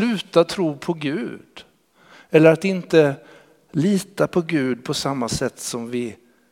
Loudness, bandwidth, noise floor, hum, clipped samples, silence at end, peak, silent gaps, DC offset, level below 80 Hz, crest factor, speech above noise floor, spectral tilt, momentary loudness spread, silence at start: -20 LUFS; 16 kHz; -52 dBFS; none; under 0.1%; 0.35 s; 0 dBFS; none; under 0.1%; -56 dBFS; 22 dB; 32 dB; -5.5 dB/octave; 13 LU; 0 s